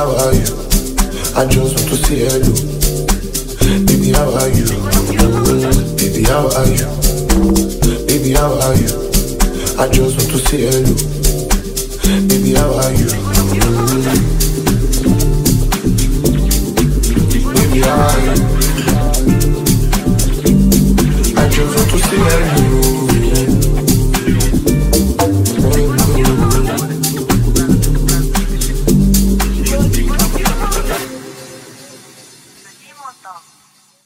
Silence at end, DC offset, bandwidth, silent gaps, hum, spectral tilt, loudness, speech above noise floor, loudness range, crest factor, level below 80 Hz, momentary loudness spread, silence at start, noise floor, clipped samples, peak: 0.65 s; under 0.1%; 16.5 kHz; none; none; -5 dB/octave; -13 LUFS; 38 dB; 2 LU; 12 dB; -16 dBFS; 5 LU; 0 s; -50 dBFS; under 0.1%; 0 dBFS